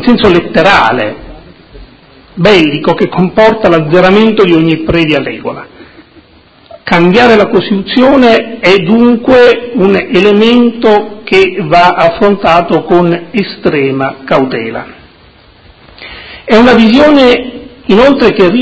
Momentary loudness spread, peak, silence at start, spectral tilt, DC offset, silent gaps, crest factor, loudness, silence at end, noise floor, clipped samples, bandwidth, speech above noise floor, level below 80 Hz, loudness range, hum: 12 LU; 0 dBFS; 0 s; -6.5 dB/octave; under 0.1%; none; 8 dB; -7 LUFS; 0 s; -41 dBFS; 4%; 8 kHz; 34 dB; -36 dBFS; 5 LU; none